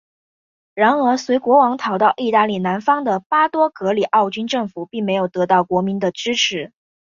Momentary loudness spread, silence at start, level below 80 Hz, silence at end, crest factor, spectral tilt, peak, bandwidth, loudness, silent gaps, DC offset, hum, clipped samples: 7 LU; 0.75 s; -64 dBFS; 0.45 s; 16 dB; -4.5 dB/octave; -2 dBFS; 7.4 kHz; -18 LUFS; 3.26-3.30 s; under 0.1%; none; under 0.1%